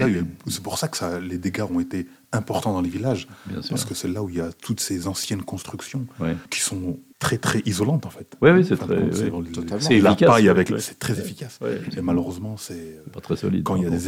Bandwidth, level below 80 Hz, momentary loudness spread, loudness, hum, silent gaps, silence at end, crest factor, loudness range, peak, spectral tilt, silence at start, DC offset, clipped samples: 16.5 kHz; -52 dBFS; 16 LU; -23 LUFS; none; none; 0 s; 20 dB; 9 LU; -4 dBFS; -5.5 dB/octave; 0 s; under 0.1%; under 0.1%